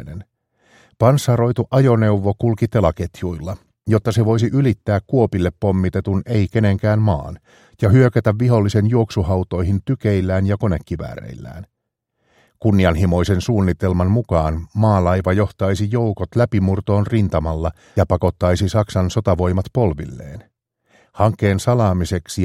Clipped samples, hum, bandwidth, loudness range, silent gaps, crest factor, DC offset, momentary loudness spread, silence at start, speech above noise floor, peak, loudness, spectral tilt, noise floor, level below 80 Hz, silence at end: under 0.1%; none; 13 kHz; 3 LU; none; 18 dB; under 0.1%; 10 LU; 0 s; 58 dB; 0 dBFS; -18 LUFS; -7.5 dB/octave; -75 dBFS; -36 dBFS; 0 s